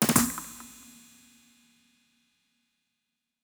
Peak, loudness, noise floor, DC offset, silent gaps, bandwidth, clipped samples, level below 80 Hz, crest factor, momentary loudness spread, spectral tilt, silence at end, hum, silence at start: -6 dBFS; -27 LUFS; -84 dBFS; under 0.1%; none; over 20 kHz; under 0.1%; -60 dBFS; 28 dB; 27 LU; -3 dB/octave; 2.75 s; none; 0 s